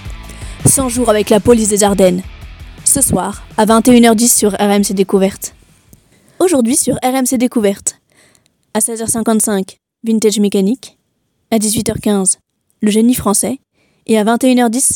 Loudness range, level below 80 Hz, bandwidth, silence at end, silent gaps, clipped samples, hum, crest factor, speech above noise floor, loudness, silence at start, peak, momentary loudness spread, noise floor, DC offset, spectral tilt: 5 LU; -38 dBFS; over 20 kHz; 0 s; none; 0.2%; none; 14 dB; 52 dB; -12 LUFS; 0 s; 0 dBFS; 11 LU; -64 dBFS; under 0.1%; -4 dB/octave